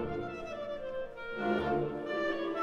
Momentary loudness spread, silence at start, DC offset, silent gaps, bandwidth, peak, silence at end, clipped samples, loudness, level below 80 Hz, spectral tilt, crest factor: 9 LU; 0 s; under 0.1%; none; 7.6 kHz; -20 dBFS; 0 s; under 0.1%; -35 LUFS; -56 dBFS; -7 dB/octave; 16 dB